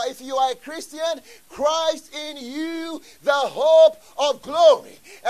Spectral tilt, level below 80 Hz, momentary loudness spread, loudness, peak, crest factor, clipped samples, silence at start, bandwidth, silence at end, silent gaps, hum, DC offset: -2 dB/octave; -66 dBFS; 17 LU; -20 LUFS; -4 dBFS; 18 dB; under 0.1%; 0 s; 14 kHz; 0 s; none; none; 0.2%